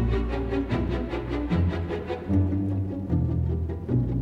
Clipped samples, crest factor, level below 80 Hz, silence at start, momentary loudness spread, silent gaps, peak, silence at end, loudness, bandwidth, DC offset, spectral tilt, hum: under 0.1%; 14 dB; -34 dBFS; 0 s; 5 LU; none; -12 dBFS; 0 s; -27 LUFS; 6 kHz; under 0.1%; -9.5 dB/octave; none